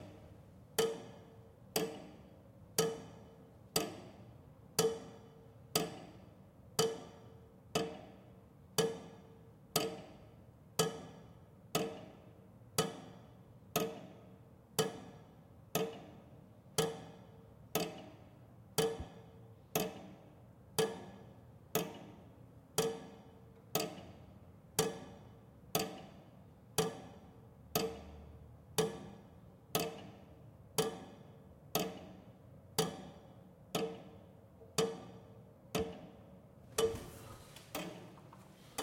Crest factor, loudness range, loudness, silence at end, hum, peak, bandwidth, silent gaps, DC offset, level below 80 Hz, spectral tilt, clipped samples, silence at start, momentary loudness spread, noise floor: 28 dB; 2 LU; -39 LUFS; 0 s; none; -16 dBFS; 16.5 kHz; none; under 0.1%; -68 dBFS; -3.5 dB/octave; under 0.1%; 0 s; 22 LU; -59 dBFS